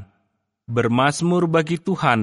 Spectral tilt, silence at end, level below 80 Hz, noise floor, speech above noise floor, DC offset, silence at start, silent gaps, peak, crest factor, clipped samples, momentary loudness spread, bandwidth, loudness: -6 dB/octave; 0 s; -58 dBFS; -71 dBFS; 53 dB; under 0.1%; 0 s; none; -2 dBFS; 18 dB; under 0.1%; 5 LU; 11.5 kHz; -20 LUFS